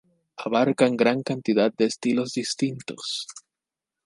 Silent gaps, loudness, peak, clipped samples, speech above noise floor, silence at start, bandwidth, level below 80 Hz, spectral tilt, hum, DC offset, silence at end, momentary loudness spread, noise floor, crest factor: none; -24 LUFS; -6 dBFS; under 0.1%; 65 dB; 0.4 s; 11.5 kHz; -72 dBFS; -4.5 dB/octave; none; under 0.1%; 0.65 s; 11 LU; -88 dBFS; 20 dB